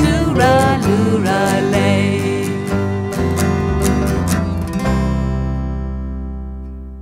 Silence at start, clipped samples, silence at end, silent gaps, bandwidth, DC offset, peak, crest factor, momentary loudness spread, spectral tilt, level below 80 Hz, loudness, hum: 0 s; under 0.1%; 0 s; none; 16 kHz; under 0.1%; 0 dBFS; 16 dB; 12 LU; -6 dB/octave; -26 dBFS; -17 LUFS; none